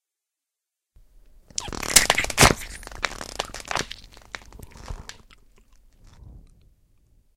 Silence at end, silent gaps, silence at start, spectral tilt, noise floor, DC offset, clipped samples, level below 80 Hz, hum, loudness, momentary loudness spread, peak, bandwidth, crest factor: 0.95 s; none; 1.6 s; -2 dB/octave; -86 dBFS; under 0.1%; under 0.1%; -40 dBFS; none; -21 LUFS; 24 LU; 0 dBFS; 16 kHz; 28 dB